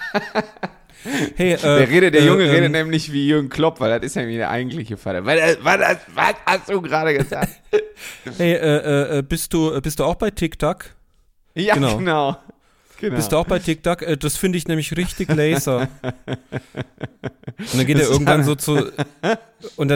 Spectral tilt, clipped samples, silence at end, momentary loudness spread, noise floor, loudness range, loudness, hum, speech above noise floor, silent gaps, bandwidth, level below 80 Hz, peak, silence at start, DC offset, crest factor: -5 dB/octave; under 0.1%; 0 s; 16 LU; -57 dBFS; 6 LU; -19 LUFS; none; 38 dB; none; 17 kHz; -42 dBFS; 0 dBFS; 0 s; under 0.1%; 18 dB